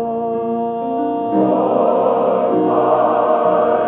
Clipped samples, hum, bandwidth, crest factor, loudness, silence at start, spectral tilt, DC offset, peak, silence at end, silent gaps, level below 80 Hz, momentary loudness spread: under 0.1%; none; 4 kHz; 12 dB; -16 LUFS; 0 s; -12 dB/octave; under 0.1%; -4 dBFS; 0 s; none; -60 dBFS; 6 LU